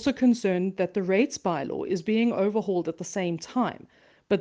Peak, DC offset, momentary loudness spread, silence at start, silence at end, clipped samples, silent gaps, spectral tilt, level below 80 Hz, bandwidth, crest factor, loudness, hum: -10 dBFS; under 0.1%; 7 LU; 0 s; 0 s; under 0.1%; none; -6 dB/octave; -64 dBFS; 9.2 kHz; 16 dB; -27 LUFS; none